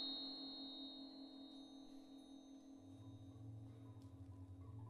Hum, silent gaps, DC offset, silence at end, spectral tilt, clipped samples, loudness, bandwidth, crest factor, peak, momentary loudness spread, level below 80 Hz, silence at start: none; none; under 0.1%; 0 s; -6 dB/octave; under 0.1%; -55 LUFS; 12 kHz; 18 dB; -38 dBFS; 11 LU; -78 dBFS; 0 s